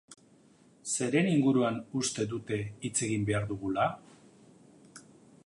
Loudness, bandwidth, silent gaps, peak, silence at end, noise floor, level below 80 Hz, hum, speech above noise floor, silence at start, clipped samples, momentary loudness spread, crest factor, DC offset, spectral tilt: -30 LUFS; 11.5 kHz; none; -14 dBFS; 0.45 s; -61 dBFS; -62 dBFS; none; 31 dB; 0.1 s; under 0.1%; 9 LU; 18 dB; under 0.1%; -5 dB/octave